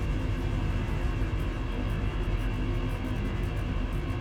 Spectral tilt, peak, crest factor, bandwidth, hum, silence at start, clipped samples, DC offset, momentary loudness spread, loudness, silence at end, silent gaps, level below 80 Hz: -7 dB/octave; -18 dBFS; 10 dB; 11.5 kHz; none; 0 s; under 0.1%; under 0.1%; 2 LU; -32 LUFS; 0 s; none; -32 dBFS